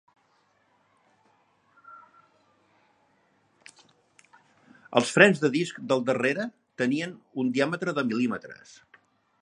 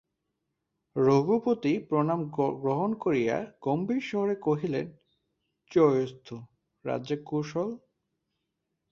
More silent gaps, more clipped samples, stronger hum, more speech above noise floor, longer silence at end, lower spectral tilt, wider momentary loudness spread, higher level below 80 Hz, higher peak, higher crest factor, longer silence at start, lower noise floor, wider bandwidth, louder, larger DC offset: neither; neither; neither; second, 42 dB vs 55 dB; second, 0.85 s vs 1.15 s; second, -5 dB/octave vs -8 dB/octave; first, 17 LU vs 13 LU; second, -76 dBFS vs -68 dBFS; first, -2 dBFS vs -10 dBFS; first, 28 dB vs 20 dB; first, 1.9 s vs 0.95 s; second, -67 dBFS vs -82 dBFS; first, 11.5 kHz vs 7.2 kHz; first, -25 LUFS vs -28 LUFS; neither